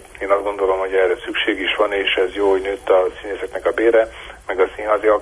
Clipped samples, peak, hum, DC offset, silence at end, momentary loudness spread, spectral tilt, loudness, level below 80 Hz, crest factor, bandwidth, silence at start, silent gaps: under 0.1%; -2 dBFS; none; under 0.1%; 0 s; 8 LU; -4 dB/octave; -18 LUFS; -46 dBFS; 16 dB; 11 kHz; 0 s; none